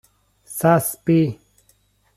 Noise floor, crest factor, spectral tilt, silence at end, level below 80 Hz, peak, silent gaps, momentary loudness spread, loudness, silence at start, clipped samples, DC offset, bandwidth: -61 dBFS; 20 dB; -6.5 dB/octave; 0.8 s; -58 dBFS; -2 dBFS; none; 15 LU; -19 LUFS; 0.5 s; under 0.1%; under 0.1%; 15.5 kHz